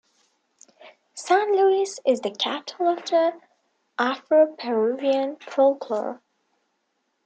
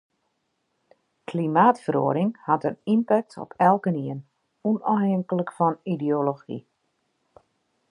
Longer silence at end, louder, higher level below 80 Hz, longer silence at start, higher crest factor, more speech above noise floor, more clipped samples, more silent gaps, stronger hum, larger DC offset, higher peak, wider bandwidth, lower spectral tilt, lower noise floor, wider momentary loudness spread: second, 1.1 s vs 1.3 s; about the same, -23 LUFS vs -24 LUFS; second, -84 dBFS vs -74 dBFS; second, 0.85 s vs 1.3 s; about the same, 16 dB vs 20 dB; about the same, 52 dB vs 52 dB; neither; neither; neither; neither; second, -8 dBFS vs -4 dBFS; second, 9.2 kHz vs 10.5 kHz; second, -3 dB/octave vs -9 dB/octave; about the same, -74 dBFS vs -75 dBFS; second, 9 LU vs 15 LU